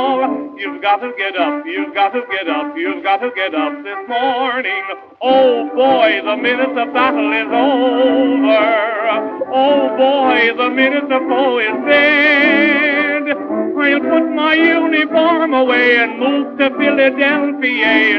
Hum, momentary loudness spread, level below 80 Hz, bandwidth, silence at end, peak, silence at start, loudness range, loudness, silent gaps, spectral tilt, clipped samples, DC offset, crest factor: none; 8 LU; -64 dBFS; 6 kHz; 0 s; 0 dBFS; 0 s; 6 LU; -14 LUFS; none; -5.5 dB/octave; under 0.1%; under 0.1%; 14 dB